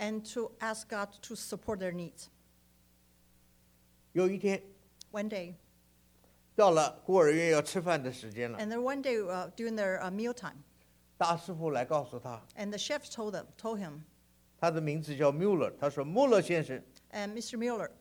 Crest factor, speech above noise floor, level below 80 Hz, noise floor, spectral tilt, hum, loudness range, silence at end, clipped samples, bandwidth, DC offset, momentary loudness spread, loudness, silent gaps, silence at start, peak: 22 dB; 34 dB; -70 dBFS; -66 dBFS; -5 dB/octave; 60 Hz at -65 dBFS; 8 LU; 0.1 s; under 0.1%; over 20 kHz; under 0.1%; 16 LU; -33 LUFS; none; 0 s; -12 dBFS